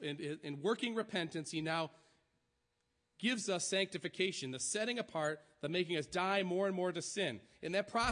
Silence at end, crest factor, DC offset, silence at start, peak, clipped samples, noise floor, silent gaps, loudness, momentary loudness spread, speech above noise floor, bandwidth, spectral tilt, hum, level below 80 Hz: 0 s; 18 dB; under 0.1%; 0 s; -20 dBFS; under 0.1%; -83 dBFS; none; -38 LUFS; 6 LU; 45 dB; 10.5 kHz; -3.5 dB/octave; none; -70 dBFS